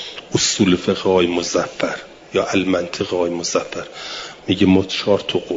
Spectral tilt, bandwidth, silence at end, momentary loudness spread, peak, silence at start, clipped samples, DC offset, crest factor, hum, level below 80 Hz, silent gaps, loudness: -4 dB/octave; 7.8 kHz; 0 s; 14 LU; -2 dBFS; 0 s; under 0.1%; under 0.1%; 16 dB; none; -54 dBFS; none; -19 LUFS